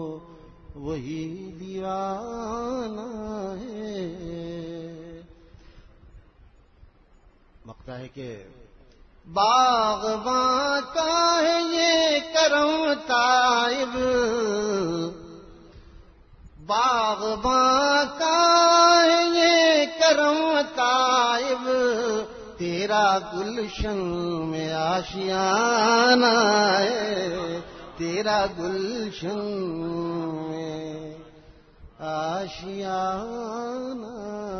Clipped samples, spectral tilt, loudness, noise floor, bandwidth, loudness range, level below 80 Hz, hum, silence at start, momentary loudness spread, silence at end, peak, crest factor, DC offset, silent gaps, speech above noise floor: under 0.1%; -3 dB/octave; -22 LUFS; -55 dBFS; 6.6 kHz; 14 LU; -50 dBFS; none; 0 s; 17 LU; 0 s; -4 dBFS; 20 dB; under 0.1%; none; 32 dB